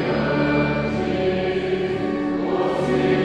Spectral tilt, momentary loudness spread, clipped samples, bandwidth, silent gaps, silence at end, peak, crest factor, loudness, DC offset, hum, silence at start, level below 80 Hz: -7.5 dB/octave; 4 LU; under 0.1%; 9.6 kHz; none; 0 s; -8 dBFS; 14 dB; -22 LUFS; under 0.1%; none; 0 s; -42 dBFS